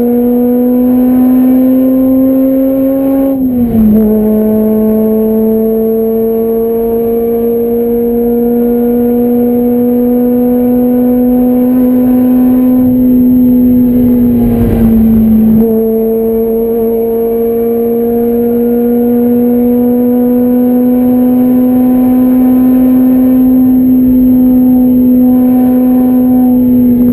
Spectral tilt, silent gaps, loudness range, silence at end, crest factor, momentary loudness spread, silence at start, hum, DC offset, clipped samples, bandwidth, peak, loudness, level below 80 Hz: -9.5 dB/octave; none; 3 LU; 0 s; 8 dB; 4 LU; 0 s; none; under 0.1%; under 0.1%; 13.5 kHz; 0 dBFS; -8 LUFS; -30 dBFS